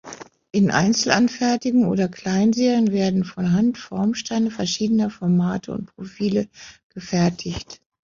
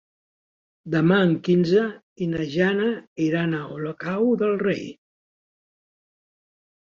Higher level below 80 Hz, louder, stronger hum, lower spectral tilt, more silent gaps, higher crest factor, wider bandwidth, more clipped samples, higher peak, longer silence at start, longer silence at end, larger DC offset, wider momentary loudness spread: first, -54 dBFS vs -62 dBFS; about the same, -21 LUFS vs -23 LUFS; neither; second, -5.5 dB/octave vs -7.5 dB/octave; second, 6.83-6.90 s vs 2.03-2.16 s, 3.07-3.16 s; about the same, 18 dB vs 20 dB; about the same, 7.6 kHz vs 7.2 kHz; neither; first, -2 dBFS vs -6 dBFS; second, 0.05 s vs 0.85 s; second, 0.35 s vs 1.9 s; neither; first, 14 LU vs 11 LU